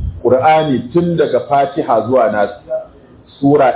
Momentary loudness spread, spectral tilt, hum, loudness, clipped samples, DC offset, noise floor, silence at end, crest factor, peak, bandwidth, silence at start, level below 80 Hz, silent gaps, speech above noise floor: 8 LU; -11 dB/octave; none; -14 LUFS; under 0.1%; under 0.1%; -41 dBFS; 0 s; 12 dB; 0 dBFS; 4 kHz; 0 s; -36 dBFS; none; 29 dB